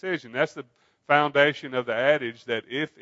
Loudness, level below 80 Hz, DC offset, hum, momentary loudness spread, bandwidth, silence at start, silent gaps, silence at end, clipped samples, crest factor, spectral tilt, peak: -24 LUFS; -78 dBFS; under 0.1%; none; 10 LU; 7.8 kHz; 0 s; none; 0.15 s; under 0.1%; 22 dB; -5.5 dB/octave; -4 dBFS